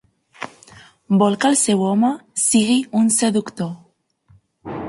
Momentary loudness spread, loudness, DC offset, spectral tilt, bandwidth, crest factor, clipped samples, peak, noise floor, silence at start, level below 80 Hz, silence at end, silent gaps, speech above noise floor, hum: 19 LU; -17 LUFS; under 0.1%; -4 dB/octave; 12 kHz; 16 dB; under 0.1%; -4 dBFS; -56 dBFS; 0.4 s; -60 dBFS; 0 s; none; 39 dB; none